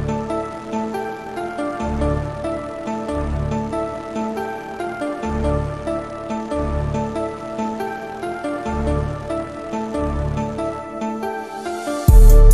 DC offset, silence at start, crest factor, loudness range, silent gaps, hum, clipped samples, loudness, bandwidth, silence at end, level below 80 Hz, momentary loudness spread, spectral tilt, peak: 0.1%; 0 s; 18 dB; 1 LU; none; none; under 0.1%; -23 LUFS; 15 kHz; 0 s; -20 dBFS; 6 LU; -7 dB/octave; 0 dBFS